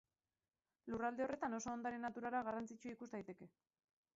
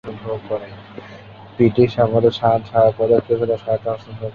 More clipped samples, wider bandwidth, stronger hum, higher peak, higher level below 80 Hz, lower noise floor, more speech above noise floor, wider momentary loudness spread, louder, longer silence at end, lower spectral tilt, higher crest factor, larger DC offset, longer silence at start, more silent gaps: neither; first, 7.6 kHz vs 6.8 kHz; neither; second, -30 dBFS vs -2 dBFS; second, -78 dBFS vs -50 dBFS; first, under -90 dBFS vs -39 dBFS; first, over 45 dB vs 22 dB; second, 14 LU vs 22 LU; second, -46 LUFS vs -18 LUFS; first, 0.65 s vs 0.05 s; second, -5 dB/octave vs -9 dB/octave; about the same, 18 dB vs 16 dB; neither; first, 0.85 s vs 0.05 s; neither